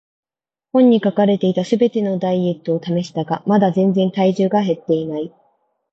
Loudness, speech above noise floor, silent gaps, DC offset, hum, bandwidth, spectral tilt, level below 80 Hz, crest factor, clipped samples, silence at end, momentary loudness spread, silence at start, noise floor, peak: -17 LUFS; 73 dB; none; under 0.1%; none; 7.8 kHz; -8 dB/octave; -64 dBFS; 16 dB; under 0.1%; 0.65 s; 8 LU; 0.75 s; -90 dBFS; -2 dBFS